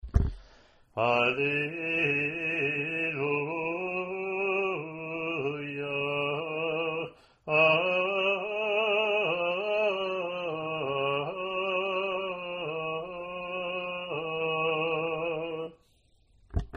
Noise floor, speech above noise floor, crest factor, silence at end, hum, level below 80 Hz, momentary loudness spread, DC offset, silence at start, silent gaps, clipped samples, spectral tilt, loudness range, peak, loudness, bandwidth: -65 dBFS; 36 dB; 20 dB; 0 s; none; -46 dBFS; 9 LU; under 0.1%; 0.05 s; none; under 0.1%; -6.5 dB/octave; 5 LU; -10 dBFS; -29 LUFS; 8.8 kHz